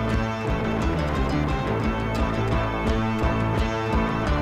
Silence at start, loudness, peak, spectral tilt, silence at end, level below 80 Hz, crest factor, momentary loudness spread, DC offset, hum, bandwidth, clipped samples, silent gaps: 0 s; -25 LUFS; -10 dBFS; -7 dB/octave; 0 s; -30 dBFS; 14 dB; 1 LU; under 0.1%; none; 13.5 kHz; under 0.1%; none